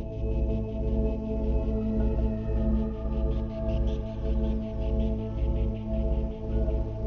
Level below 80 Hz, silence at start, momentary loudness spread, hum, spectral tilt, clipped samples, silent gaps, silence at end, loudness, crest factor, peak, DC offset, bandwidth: -30 dBFS; 0 s; 3 LU; none; -10.5 dB/octave; under 0.1%; none; 0 s; -30 LUFS; 14 dB; -14 dBFS; under 0.1%; 4.2 kHz